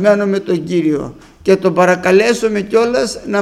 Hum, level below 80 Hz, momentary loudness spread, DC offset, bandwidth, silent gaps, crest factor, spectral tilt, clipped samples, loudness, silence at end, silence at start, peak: none; -48 dBFS; 7 LU; under 0.1%; 13.5 kHz; none; 14 dB; -5.5 dB/octave; under 0.1%; -14 LUFS; 0 s; 0 s; 0 dBFS